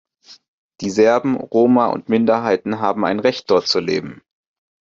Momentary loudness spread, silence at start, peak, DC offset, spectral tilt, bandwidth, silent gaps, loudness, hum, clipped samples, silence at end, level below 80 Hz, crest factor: 8 LU; 0.3 s; -2 dBFS; under 0.1%; -5.5 dB/octave; 7.6 kHz; 0.48-0.69 s; -17 LUFS; none; under 0.1%; 0.65 s; -60 dBFS; 16 dB